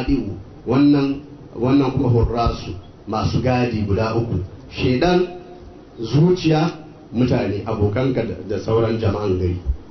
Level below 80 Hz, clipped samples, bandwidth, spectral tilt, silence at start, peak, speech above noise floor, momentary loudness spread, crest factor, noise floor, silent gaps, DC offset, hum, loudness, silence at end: -34 dBFS; under 0.1%; 6.4 kHz; -8 dB/octave; 0 s; -6 dBFS; 21 dB; 14 LU; 14 dB; -40 dBFS; none; under 0.1%; none; -20 LUFS; 0 s